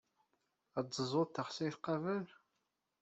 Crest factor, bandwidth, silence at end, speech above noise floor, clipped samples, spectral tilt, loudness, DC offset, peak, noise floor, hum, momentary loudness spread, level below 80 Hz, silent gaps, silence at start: 18 dB; 8.2 kHz; 0.7 s; 47 dB; under 0.1%; -5.5 dB/octave; -40 LUFS; under 0.1%; -24 dBFS; -86 dBFS; none; 8 LU; -80 dBFS; none; 0.75 s